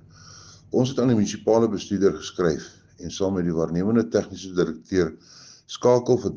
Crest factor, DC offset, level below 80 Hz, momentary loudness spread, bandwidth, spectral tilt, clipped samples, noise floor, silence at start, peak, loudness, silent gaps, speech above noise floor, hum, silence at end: 18 dB; under 0.1%; -54 dBFS; 9 LU; 7.6 kHz; -6.5 dB/octave; under 0.1%; -47 dBFS; 0.25 s; -6 dBFS; -23 LUFS; none; 24 dB; none; 0 s